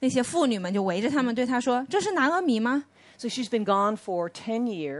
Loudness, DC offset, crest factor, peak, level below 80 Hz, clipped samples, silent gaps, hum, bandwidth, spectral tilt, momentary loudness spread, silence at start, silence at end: -26 LUFS; under 0.1%; 16 dB; -10 dBFS; -70 dBFS; under 0.1%; none; none; 11.5 kHz; -4.5 dB/octave; 7 LU; 0 s; 0 s